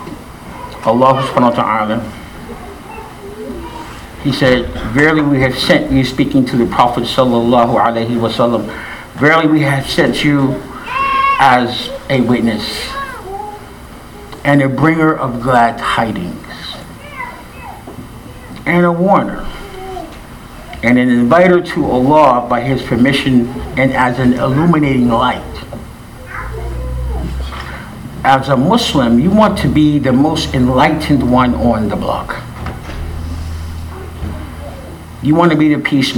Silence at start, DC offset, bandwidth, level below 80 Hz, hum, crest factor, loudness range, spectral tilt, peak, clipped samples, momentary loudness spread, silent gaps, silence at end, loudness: 0 s; under 0.1%; 18.5 kHz; -30 dBFS; none; 14 dB; 7 LU; -6.5 dB/octave; 0 dBFS; 0.1%; 19 LU; none; 0 s; -13 LUFS